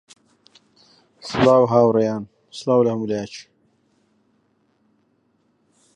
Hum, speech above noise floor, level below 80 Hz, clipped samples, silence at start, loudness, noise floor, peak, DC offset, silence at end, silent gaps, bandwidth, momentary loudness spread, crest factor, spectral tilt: none; 47 dB; -60 dBFS; under 0.1%; 1.25 s; -19 LUFS; -65 dBFS; -2 dBFS; under 0.1%; 2.55 s; none; 10 kHz; 21 LU; 20 dB; -6.5 dB/octave